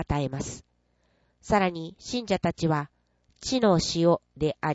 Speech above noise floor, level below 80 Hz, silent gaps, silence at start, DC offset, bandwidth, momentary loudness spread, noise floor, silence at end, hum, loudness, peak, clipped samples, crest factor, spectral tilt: 43 dB; -48 dBFS; none; 0 s; under 0.1%; 8 kHz; 14 LU; -69 dBFS; 0 s; 60 Hz at -55 dBFS; -27 LUFS; -8 dBFS; under 0.1%; 18 dB; -5.5 dB/octave